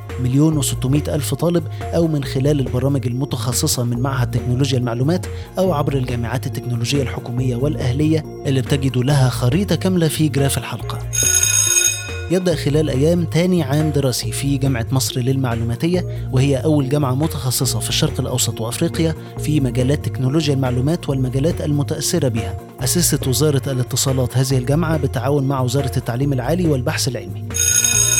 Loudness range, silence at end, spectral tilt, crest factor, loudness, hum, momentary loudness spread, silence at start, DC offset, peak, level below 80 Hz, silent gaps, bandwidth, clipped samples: 4 LU; 0 s; -4.5 dB/octave; 16 dB; -18 LUFS; none; 6 LU; 0 s; under 0.1%; -2 dBFS; -36 dBFS; none; over 20 kHz; under 0.1%